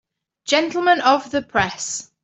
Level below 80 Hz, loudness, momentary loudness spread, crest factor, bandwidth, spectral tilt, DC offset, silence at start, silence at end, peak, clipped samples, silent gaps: -54 dBFS; -19 LUFS; 10 LU; 18 dB; 8.4 kHz; -2.5 dB/octave; under 0.1%; 0.45 s; 0.2 s; -2 dBFS; under 0.1%; none